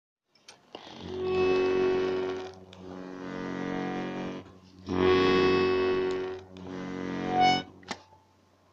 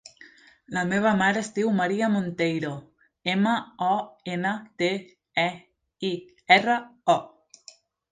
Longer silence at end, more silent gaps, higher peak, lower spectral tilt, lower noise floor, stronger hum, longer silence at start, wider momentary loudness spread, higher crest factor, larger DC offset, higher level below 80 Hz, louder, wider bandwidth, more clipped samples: second, 0.7 s vs 0.85 s; neither; second, -12 dBFS vs -4 dBFS; about the same, -6 dB/octave vs -5 dB/octave; first, -63 dBFS vs -53 dBFS; neither; second, 0.5 s vs 0.7 s; first, 20 LU vs 13 LU; about the same, 18 dB vs 22 dB; neither; first, -60 dBFS vs -68 dBFS; second, -28 LUFS vs -25 LUFS; second, 7.6 kHz vs 9.6 kHz; neither